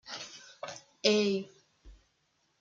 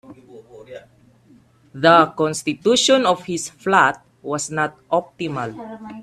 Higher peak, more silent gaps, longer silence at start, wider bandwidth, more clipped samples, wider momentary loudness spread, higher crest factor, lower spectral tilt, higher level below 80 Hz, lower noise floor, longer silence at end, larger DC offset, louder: second, -10 dBFS vs 0 dBFS; neither; about the same, 0.05 s vs 0.1 s; second, 7.6 kHz vs 14 kHz; neither; about the same, 19 LU vs 20 LU; first, 26 dB vs 20 dB; about the same, -3.5 dB/octave vs -3.5 dB/octave; about the same, -64 dBFS vs -62 dBFS; first, -75 dBFS vs -52 dBFS; first, 0.65 s vs 0 s; neither; second, -30 LUFS vs -18 LUFS